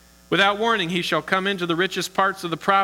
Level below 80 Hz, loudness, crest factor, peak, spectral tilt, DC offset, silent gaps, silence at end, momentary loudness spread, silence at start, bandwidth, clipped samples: -58 dBFS; -21 LUFS; 18 dB; -4 dBFS; -4 dB/octave; under 0.1%; none; 0 s; 5 LU; 0.3 s; 18 kHz; under 0.1%